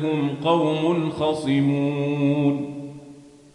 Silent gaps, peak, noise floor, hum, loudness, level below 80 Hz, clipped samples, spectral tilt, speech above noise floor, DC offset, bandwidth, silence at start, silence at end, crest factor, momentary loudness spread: none; -6 dBFS; -46 dBFS; none; -22 LUFS; -62 dBFS; under 0.1%; -7.5 dB/octave; 24 dB; under 0.1%; 11 kHz; 0 s; 0.25 s; 16 dB; 13 LU